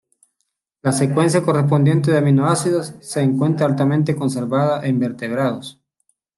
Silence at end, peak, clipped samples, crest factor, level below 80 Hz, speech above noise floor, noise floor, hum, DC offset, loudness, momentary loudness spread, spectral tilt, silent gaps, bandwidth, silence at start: 0.65 s; -4 dBFS; under 0.1%; 14 dB; -60 dBFS; 57 dB; -74 dBFS; none; under 0.1%; -18 LUFS; 7 LU; -6.5 dB/octave; none; 12.5 kHz; 0.85 s